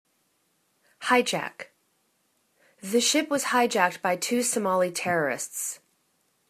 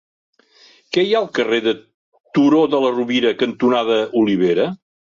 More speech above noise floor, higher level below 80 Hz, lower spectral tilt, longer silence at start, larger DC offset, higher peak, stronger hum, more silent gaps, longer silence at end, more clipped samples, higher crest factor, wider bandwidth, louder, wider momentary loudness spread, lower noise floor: first, 45 dB vs 35 dB; second, -76 dBFS vs -62 dBFS; second, -2.5 dB/octave vs -6 dB/octave; about the same, 1 s vs 0.9 s; neither; about the same, -6 dBFS vs -4 dBFS; neither; second, none vs 1.94-2.12 s, 2.20-2.24 s; first, 0.75 s vs 0.4 s; neither; first, 22 dB vs 14 dB; first, 14 kHz vs 7.4 kHz; second, -25 LUFS vs -17 LUFS; first, 14 LU vs 8 LU; first, -71 dBFS vs -51 dBFS